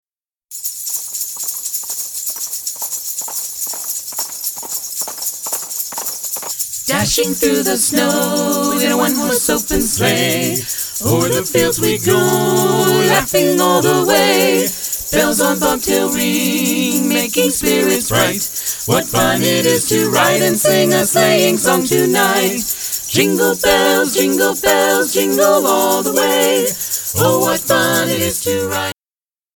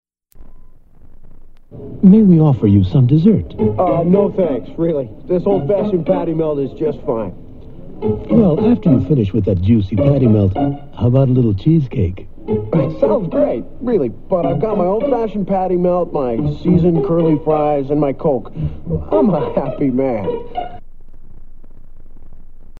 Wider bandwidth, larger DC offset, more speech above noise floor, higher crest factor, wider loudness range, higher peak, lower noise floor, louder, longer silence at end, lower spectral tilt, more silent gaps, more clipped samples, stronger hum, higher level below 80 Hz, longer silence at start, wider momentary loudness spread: first, over 20 kHz vs 4.7 kHz; neither; first, over 76 dB vs 23 dB; about the same, 16 dB vs 16 dB; about the same, 7 LU vs 6 LU; about the same, 0 dBFS vs 0 dBFS; first, under -90 dBFS vs -37 dBFS; about the same, -14 LUFS vs -15 LUFS; first, 0.65 s vs 0 s; second, -3 dB/octave vs -11.5 dB/octave; neither; neither; neither; second, -44 dBFS vs -34 dBFS; first, 0.5 s vs 0.35 s; about the same, 8 LU vs 10 LU